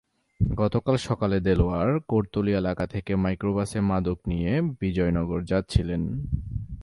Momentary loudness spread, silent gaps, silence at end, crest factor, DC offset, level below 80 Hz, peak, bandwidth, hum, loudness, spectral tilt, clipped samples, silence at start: 6 LU; none; 0 s; 18 dB; under 0.1%; -36 dBFS; -6 dBFS; 11.5 kHz; none; -26 LUFS; -8 dB/octave; under 0.1%; 0.4 s